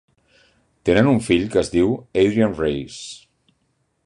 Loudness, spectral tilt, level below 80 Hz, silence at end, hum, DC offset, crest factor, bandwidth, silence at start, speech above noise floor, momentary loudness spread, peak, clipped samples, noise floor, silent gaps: -19 LUFS; -6 dB/octave; -44 dBFS; 0.9 s; none; under 0.1%; 18 dB; 11 kHz; 0.85 s; 50 dB; 17 LU; -2 dBFS; under 0.1%; -68 dBFS; none